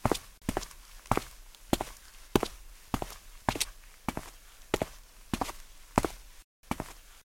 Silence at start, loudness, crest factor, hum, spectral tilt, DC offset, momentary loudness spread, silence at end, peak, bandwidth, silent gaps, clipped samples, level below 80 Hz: 0 s; -35 LUFS; 30 dB; none; -4.5 dB/octave; under 0.1%; 19 LU; 0.05 s; -4 dBFS; 16.5 kHz; 6.44-6.63 s; under 0.1%; -46 dBFS